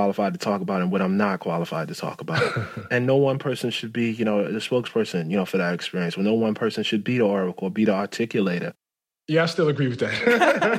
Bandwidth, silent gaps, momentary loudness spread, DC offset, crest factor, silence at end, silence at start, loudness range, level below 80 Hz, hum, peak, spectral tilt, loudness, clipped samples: 15 kHz; none; 6 LU; under 0.1%; 18 dB; 0 s; 0 s; 1 LU; -68 dBFS; none; -6 dBFS; -6 dB/octave; -23 LUFS; under 0.1%